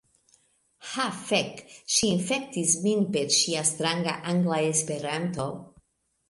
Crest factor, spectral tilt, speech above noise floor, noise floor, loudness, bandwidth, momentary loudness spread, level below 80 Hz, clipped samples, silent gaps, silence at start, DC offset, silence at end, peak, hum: 18 dB; -3 dB/octave; 39 dB; -65 dBFS; -26 LUFS; 11.5 kHz; 12 LU; -64 dBFS; under 0.1%; none; 0.8 s; under 0.1%; 0.65 s; -10 dBFS; none